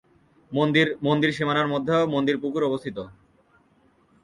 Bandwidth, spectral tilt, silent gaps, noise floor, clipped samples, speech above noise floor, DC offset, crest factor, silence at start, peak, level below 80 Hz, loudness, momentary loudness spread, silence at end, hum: 11 kHz; -6.5 dB/octave; none; -61 dBFS; under 0.1%; 38 dB; under 0.1%; 18 dB; 0.5 s; -6 dBFS; -62 dBFS; -23 LUFS; 11 LU; 1.1 s; none